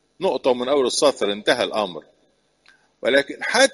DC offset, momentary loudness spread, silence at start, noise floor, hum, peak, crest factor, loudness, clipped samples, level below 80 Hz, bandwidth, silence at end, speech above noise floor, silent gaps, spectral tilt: under 0.1%; 8 LU; 0.2 s; -64 dBFS; none; 0 dBFS; 22 dB; -21 LUFS; under 0.1%; -64 dBFS; 11.5 kHz; 0 s; 44 dB; none; -2 dB/octave